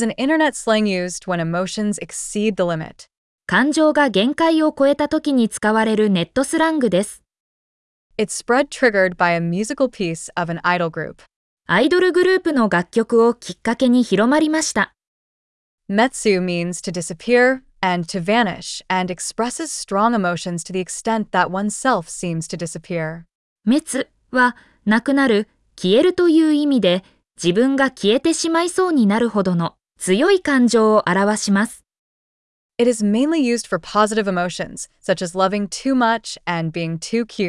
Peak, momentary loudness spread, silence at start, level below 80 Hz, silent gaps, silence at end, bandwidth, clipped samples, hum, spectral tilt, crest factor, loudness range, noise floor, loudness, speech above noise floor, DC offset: -4 dBFS; 10 LU; 0 s; -54 dBFS; 3.17-3.38 s, 7.40-8.10 s, 11.36-11.57 s, 15.07-15.78 s, 23.35-23.56 s, 31.99-32.69 s; 0 s; 12 kHz; under 0.1%; none; -4.5 dB/octave; 16 dB; 4 LU; under -90 dBFS; -18 LUFS; over 72 dB; under 0.1%